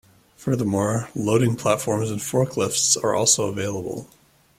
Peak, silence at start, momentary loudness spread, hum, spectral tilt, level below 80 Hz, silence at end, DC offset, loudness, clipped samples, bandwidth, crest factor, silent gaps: -4 dBFS; 0.4 s; 10 LU; none; -4 dB/octave; -58 dBFS; 0.55 s; under 0.1%; -21 LUFS; under 0.1%; 16 kHz; 18 dB; none